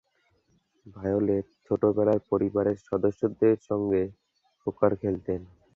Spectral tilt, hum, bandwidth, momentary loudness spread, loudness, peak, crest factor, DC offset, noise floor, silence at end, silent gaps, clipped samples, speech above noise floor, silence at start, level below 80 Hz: -10.5 dB/octave; none; 7.2 kHz; 11 LU; -27 LUFS; -8 dBFS; 18 dB; under 0.1%; -69 dBFS; 0.3 s; none; under 0.1%; 43 dB; 0.85 s; -56 dBFS